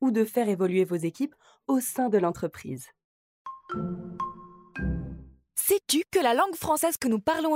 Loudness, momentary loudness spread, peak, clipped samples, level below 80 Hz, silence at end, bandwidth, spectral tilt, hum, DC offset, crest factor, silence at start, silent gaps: -27 LUFS; 17 LU; -10 dBFS; under 0.1%; -48 dBFS; 0 s; 16 kHz; -4.5 dB/octave; none; under 0.1%; 18 dB; 0 s; 3.04-3.45 s